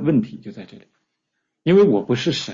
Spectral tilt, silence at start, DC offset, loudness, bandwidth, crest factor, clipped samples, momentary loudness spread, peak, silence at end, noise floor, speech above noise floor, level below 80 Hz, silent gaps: -6.5 dB/octave; 0 s; under 0.1%; -18 LUFS; 7.6 kHz; 16 dB; under 0.1%; 22 LU; -6 dBFS; 0 s; -77 dBFS; 58 dB; -58 dBFS; none